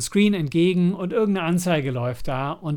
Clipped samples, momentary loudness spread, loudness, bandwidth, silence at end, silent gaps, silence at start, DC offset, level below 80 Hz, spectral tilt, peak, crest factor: under 0.1%; 7 LU; -22 LUFS; 18 kHz; 0 s; none; 0 s; under 0.1%; -48 dBFS; -6 dB/octave; -6 dBFS; 14 dB